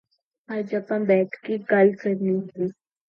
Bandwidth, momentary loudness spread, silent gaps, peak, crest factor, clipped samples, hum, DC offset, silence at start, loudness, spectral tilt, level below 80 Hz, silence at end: 5.8 kHz; 12 LU; none; -6 dBFS; 18 dB; under 0.1%; none; under 0.1%; 0.5 s; -24 LUFS; -9.5 dB/octave; -74 dBFS; 0.35 s